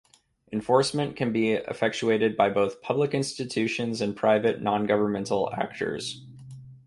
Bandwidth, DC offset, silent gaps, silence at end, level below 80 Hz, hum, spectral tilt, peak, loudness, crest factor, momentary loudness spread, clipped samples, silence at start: 11.5 kHz; under 0.1%; none; 0.1 s; -62 dBFS; none; -5 dB/octave; -6 dBFS; -26 LUFS; 20 dB; 11 LU; under 0.1%; 0.5 s